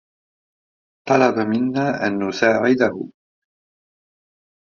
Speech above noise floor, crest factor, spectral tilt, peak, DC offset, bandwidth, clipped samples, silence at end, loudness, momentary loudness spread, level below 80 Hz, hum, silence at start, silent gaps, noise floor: over 72 dB; 22 dB; -4.5 dB/octave; 0 dBFS; under 0.1%; 7.2 kHz; under 0.1%; 1.6 s; -19 LUFS; 13 LU; -64 dBFS; none; 1.05 s; none; under -90 dBFS